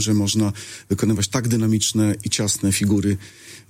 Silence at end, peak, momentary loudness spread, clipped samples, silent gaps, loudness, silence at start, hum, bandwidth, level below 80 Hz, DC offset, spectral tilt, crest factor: 0.1 s; -4 dBFS; 8 LU; under 0.1%; none; -20 LUFS; 0 s; none; 16.5 kHz; -50 dBFS; under 0.1%; -4.5 dB/octave; 16 dB